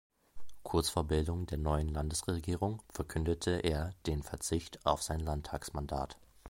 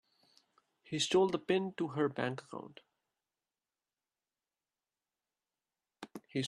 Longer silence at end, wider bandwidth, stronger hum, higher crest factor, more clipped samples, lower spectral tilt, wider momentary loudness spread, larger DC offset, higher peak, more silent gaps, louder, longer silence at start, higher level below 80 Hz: about the same, 0 s vs 0 s; first, 16.5 kHz vs 12 kHz; neither; about the same, 22 dB vs 22 dB; neither; about the same, -5 dB/octave vs -4.5 dB/octave; second, 7 LU vs 21 LU; neither; first, -12 dBFS vs -18 dBFS; neither; about the same, -36 LUFS vs -34 LUFS; second, 0.35 s vs 0.9 s; first, -42 dBFS vs -80 dBFS